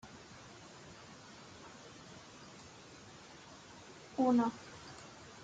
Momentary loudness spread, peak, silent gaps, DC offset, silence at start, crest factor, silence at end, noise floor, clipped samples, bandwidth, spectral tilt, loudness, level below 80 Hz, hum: 22 LU; -22 dBFS; none; under 0.1%; 0.05 s; 20 dB; 0 s; -55 dBFS; under 0.1%; 9.2 kHz; -5 dB/octave; -35 LUFS; -74 dBFS; none